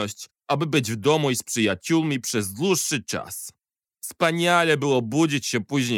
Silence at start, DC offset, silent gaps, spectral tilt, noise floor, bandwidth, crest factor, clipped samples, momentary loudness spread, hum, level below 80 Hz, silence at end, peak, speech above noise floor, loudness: 0 s; under 0.1%; none; -4 dB/octave; -44 dBFS; 18 kHz; 18 dB; under 0.1%; 14 LU; none; -68 dBFS; 0 s; -6 dBFS; 21 dB; -23 LUFS